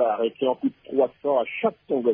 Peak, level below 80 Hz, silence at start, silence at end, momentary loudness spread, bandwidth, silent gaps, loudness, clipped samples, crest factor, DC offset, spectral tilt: -8 dBFS; -72 dBFS; 0 s; 0 s; 3 LU; 3.6 kHz; none; -25 LUFS; under 0.1%; 16 dB; under 0.1%; -9.5 dB/octave